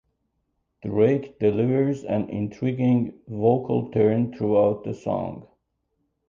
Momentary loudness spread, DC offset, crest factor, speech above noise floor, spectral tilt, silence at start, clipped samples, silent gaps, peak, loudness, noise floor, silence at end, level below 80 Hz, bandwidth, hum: 9 LU; under 0.1%; 18 dB; 52 dB; -9.5 dB/octave; 0.85 s; under 0.1%; none; -6 dBFS; -23 LUFS; -74 dBFS; 0.9 s; -58 dBFS; 7.4 kHz; none